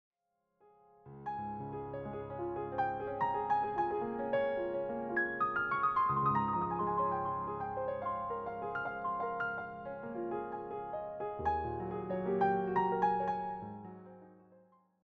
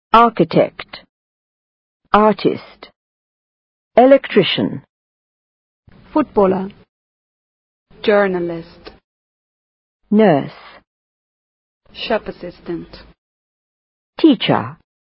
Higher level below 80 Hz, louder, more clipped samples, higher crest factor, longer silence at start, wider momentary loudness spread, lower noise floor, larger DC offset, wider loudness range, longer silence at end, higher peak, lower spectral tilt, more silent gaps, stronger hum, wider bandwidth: second, -62 dBFS vs -50 dBFS; second, -36 LUFS vs -15 LUFS; neither; about the same, 16 dB vs 18 dB; first, 1.05 s vs 0.15 s; second, 11 LU vs 19 LU; second, -82 dBFS vs under -90 dBFS; neither; about the same, 6 LU vs 6 LU; first, 0.5 s vs 0.3 s; second, -20 dBFS vs 0 dBFS; second, -5.5 dB/octave vs -8.5 dB/octave; second, none vs 1.09-2.00 s, 2.96-3.91 s, 4.89-5.83 s, 6.89-7.86 s, 9.04-10.00 s, 10.87-11.81 s, 13.18-14.13 s; neither; first, 6.4 kHz vs 5.8 kHz